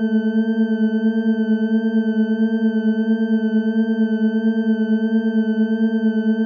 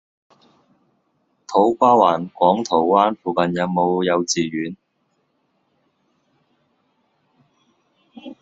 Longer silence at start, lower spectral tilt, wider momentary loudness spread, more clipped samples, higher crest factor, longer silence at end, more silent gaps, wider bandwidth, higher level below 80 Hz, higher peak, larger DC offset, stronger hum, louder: second, 0 s vs 1.5 s; first, -9.5 dB/octave vs -4.5 dB/octave; second, 1 LU vs 14 LU; neither; second, 10 dB vs 20 dB; about the same, 0 s vs 0.1 s; neither; second, 4.9 kHz vs 8 kHz; second, -78 dBFS vs -64 dBFS; second, -8 dBFS vs -2 dBFS; neither; neither; about the same, -19 LUFS vs -18 LUFS